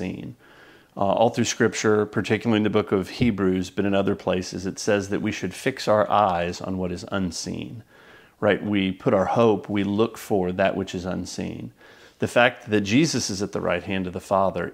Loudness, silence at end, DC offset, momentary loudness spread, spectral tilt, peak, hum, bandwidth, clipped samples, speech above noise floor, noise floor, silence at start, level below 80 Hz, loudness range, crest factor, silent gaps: -23 LUFS; 0 s; under 0.1%; 11 LU; -5 dB/octave; -2 dBFS; none; 16 kHz; under 0.1%; 28 dB; -51 dBFS; 0 s; -54 dBFS; 2 LU; 22 dB; none